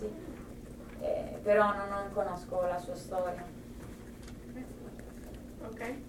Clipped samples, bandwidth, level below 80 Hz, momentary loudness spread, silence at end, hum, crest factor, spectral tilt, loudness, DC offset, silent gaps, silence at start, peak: under 0.1%; 17 kHz; -52 dBFS; 19 LU; 0 s; none; 22 dB; -6 dB/octave; -34 LUFS; under 0.1%; none; 0 s; -14 dBFS